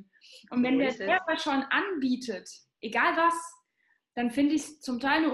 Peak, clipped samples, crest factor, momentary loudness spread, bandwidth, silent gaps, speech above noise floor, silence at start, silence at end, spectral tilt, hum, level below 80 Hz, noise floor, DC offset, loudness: -10 dBFS; under 0.1%; 18 dB; 13 LU; 12.5 kHz; none; 45 dB; 0.3 s; 0 s; -3.5 dB/octave; none; -68 dBFS; -73 dBFS; under 0.1%; -28 LUFS